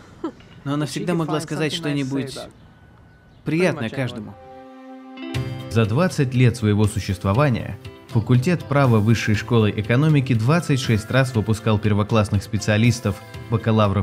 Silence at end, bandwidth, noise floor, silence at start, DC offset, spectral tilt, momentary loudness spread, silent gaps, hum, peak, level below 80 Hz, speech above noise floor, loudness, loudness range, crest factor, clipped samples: 0 s; 15 kHz; -49 dBFS; 0.1 s; under 0.1%; -6.5 dB/octave; 16 LU; none; none; -4 dBFS; -50 dBFS; 29 dB; -20 LUFS; 7 LU; 16 dB; under 0.1%